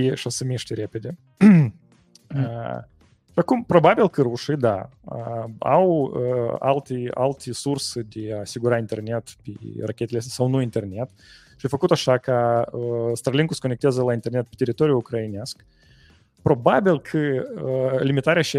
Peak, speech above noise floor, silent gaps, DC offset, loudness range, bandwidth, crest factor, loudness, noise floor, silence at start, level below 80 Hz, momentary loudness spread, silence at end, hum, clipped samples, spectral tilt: -2 dBFS; 33 dB; none; under 0.1%; 6 LU; 15 kHz; 20 dB; -22 LUFS; -54 dBFS; 0 s; -58 dBFS; 14 LU; 0 s; none; under 0.1%; -6.5 dB/octave